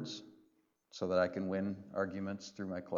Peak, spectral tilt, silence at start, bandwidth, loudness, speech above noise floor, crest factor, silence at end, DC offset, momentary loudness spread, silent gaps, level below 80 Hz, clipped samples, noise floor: -20 dBFS; -6 dB/octave; 0 s; 7.6 kHz; -38 LUFS; 37 dB; 18 dB; 0 s; under 0.1%; 12 LU; none; -76 dBFS; under 0.1%; -74 dBFS